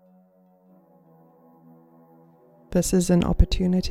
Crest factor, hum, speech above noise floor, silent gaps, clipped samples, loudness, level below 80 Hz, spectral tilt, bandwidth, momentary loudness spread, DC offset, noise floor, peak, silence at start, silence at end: 20 dB; none; 38 dB; none; under 0.1%; -22 LUFS; -30 dBFS; -6 dB/octave; 15 kHz; 5 LU; under 0.1%; -58 dBFS; -4 dBFS; 2.7 s; 0 s